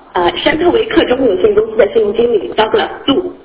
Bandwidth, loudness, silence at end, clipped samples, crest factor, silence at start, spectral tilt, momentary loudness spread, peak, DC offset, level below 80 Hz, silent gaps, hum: 4 kHz; -12 LUFS; 0.1 s; under 0.1%; 12 dB; 0.15 s; -9 dB/octave; 3 LU; 0 dBFS; under 0.1%; -40 dBFS; none; none